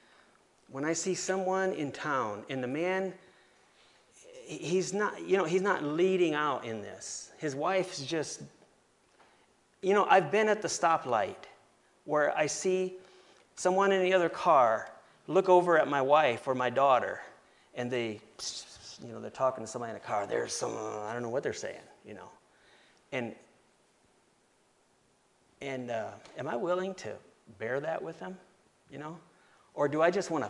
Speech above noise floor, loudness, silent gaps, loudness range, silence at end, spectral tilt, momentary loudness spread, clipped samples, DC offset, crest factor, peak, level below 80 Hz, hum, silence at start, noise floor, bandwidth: 39 dB; -30 LUFS; none; 13 LU; 0 s; -4 dB/octave; 20 LU; under 0.1%; under 0.1%; 24 dB; -8 dBFS; -78 dBFS; none; 0.7 s; -69 dBFS; 11.5 kHz